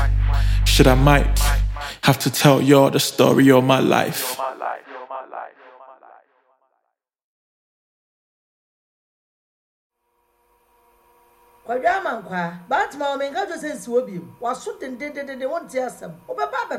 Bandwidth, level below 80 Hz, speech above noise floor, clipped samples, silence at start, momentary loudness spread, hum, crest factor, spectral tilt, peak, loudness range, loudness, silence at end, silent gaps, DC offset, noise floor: 17 kHz; -28 dBFS; 57 dB; under 0.1%; 0 s; 18 LU; none; 20 dB; -5 dB/octave; 0 dBFS; 16 LU; -19 LUFS; 0 s; 7.24-9.90 s; under 0.1%; -75 dBFS